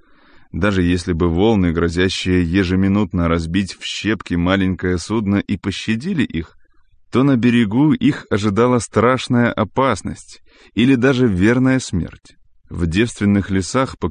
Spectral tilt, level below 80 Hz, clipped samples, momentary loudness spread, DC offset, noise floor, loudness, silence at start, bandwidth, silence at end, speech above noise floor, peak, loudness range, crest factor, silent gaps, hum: -6 dB/octave; -34 dBFS; under 0.1%; 8 LU; under 0.1%; -50 dBFS; -17 LUFS; 0.55 s; 10 kHz; 0 s; 33 dB; -4 dBFS; 3 LU; 14 dB; none; none